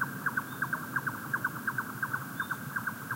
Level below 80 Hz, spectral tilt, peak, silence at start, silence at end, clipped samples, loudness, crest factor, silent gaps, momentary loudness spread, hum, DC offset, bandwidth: -72 dBFS; -4.5 dB/octave; -18 dBFS; 0 s; 0 s; under 0.1%; -34 LUFS; 16 dB; none; 3 LU; none; under 0.1%; 16 kHz